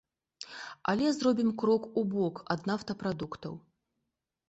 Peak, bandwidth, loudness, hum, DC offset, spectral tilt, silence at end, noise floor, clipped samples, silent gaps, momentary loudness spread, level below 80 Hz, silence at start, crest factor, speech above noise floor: -12 dBFS; 8.2 kHz; -31 LUFS; none; under 0.1%; -6 dB/octave; 0.9 s; -85 dBFS; under 0.1%; none; 16 LU; -66 dBFS; 0.4 s; 20 dB; 54 dB